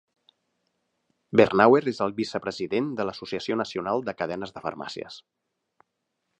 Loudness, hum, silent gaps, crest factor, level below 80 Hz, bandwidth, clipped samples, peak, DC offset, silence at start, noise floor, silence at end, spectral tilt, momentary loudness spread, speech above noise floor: -25 LUFS; none; none; 24 dB; -64 dBFS; 9.2 kHz; under 0.1%; -2 dBFS; under 0.1%; 1.3 s; -80 dBFS; 1.2 s; -6 dB/octave; 17 LU; 55 dB